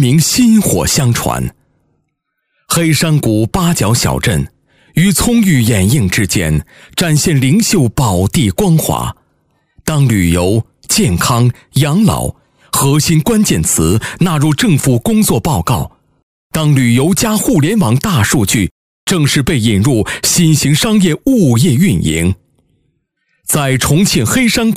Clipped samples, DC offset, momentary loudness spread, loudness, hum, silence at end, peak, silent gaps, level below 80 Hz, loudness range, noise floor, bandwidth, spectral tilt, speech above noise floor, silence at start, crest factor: under 0.1%; under 0.1%; 7 LU; -12 LUFS; none; 0 s; 0 dBFS; 16.23-16.50 s, 18.71-19.07 s; -34 dBFS; 2 LU; -69 dBFS; 16 kHz; -5 dB/octave; 58 dB; 0 s; 12 dB